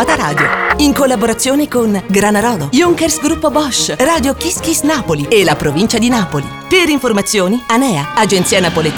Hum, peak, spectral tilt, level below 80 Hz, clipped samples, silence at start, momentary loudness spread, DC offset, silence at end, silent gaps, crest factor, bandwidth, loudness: none; 0 dBFS; -4 dB/octave; -36 dBFS; under 0.1%; 0 s; 3 LU; 0.2%; 0 s; none; 12 dB; over 20 kHz; -12 LUFS